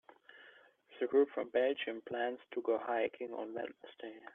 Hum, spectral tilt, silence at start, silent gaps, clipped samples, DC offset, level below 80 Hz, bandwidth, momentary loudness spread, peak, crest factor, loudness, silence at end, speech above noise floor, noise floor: none; -7 dB/octave; 0.35 s; none; under 0.1%; under 0.1%; -86 dBFS; 3.9 kHz; 17 LU; -18 dBFS; 18 dB; -37 LUFS; 0.05 s; 26 dB; -62 dBFS